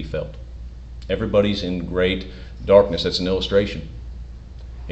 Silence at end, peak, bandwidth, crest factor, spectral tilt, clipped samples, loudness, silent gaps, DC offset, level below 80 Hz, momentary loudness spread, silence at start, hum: 0 s; 0 dBFS; 8.2 kHz; 22 dB; -6 dB/octave; under 0.1%; -20 LUFS; none; under 0.1%; -34 dBFS; 23 LU; 0 s; none